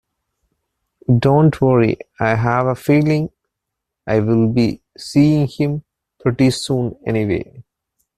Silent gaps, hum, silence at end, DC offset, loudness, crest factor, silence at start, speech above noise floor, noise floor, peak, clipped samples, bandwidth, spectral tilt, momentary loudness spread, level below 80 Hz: none; none; 0.55 s; under 0.1%; -17 LUFS; 16 dB; 1.1 s; 64 dB; -80 dBFS; -2 dBFS; under 0.1%; 13.5 kHz; -7.5 dB/octave; 10 LU; -46 dBFS